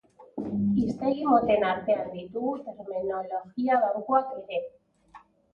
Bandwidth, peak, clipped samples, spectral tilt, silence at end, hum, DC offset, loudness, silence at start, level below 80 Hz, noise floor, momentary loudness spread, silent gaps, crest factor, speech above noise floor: 6.8 kHz; -10 dBFS; under 0.1%; -8.5 dB/octave; 0.35 s; none; under 0.1%; -27 LUFS; 0.2 s; -60 dBFS; -55 dBFS; 12 LU; none; 18 dB; 28 dB